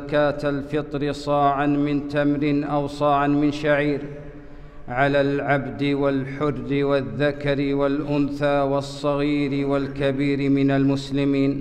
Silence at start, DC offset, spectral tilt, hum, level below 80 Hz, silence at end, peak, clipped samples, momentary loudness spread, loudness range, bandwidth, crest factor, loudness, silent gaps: 0 s; under 0.1%; -7.5 dB/octave; none; -42 dBFS; 0 s; -8 dBFS; under 0.1%; 6 LU; 2 LU; 9 kHz; 14 dB; -22 LUFS; none